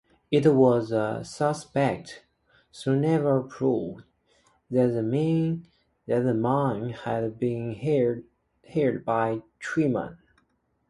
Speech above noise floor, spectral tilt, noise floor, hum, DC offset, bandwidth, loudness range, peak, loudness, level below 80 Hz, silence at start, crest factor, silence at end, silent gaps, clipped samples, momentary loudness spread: 46 dB; -7.5 dB/octave; -71 dBFS; none; under 0.1%; 11.5 kHz; 3 LU; -8 dBFS; -26 LUFS; -62 dBFS; 0.3 s; 18 dB; 0.75 s; none; under 0.1%; 11 LU